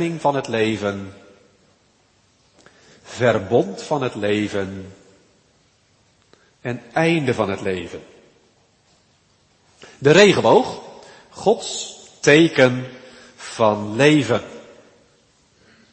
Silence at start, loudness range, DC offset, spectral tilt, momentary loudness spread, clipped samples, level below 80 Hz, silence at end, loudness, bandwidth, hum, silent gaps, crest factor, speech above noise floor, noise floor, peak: 0 s; 8 LU; under 0.1%; -5 dB/octave; 22 LU; under 0.1%; -60 dBFS; 1.3 s; -18 LUFS; 8.8 kHz; none; none; 22 dB; 41 dB; -59 dBFS; 0 dBFS